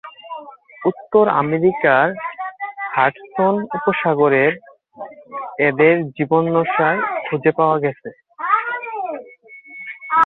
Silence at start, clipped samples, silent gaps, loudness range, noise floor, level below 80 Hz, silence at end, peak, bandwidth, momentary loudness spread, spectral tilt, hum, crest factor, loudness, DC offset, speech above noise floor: 0.05 s; under 0.1%; none; 2 LU; -42 dBFS; -62 dBFS; 0 s; 0 dBFS; 4.2 kHz; 19 LU; -9.5 dB/octave; none; 18 dB; -18 LUFS; under 0.1%; 26 dB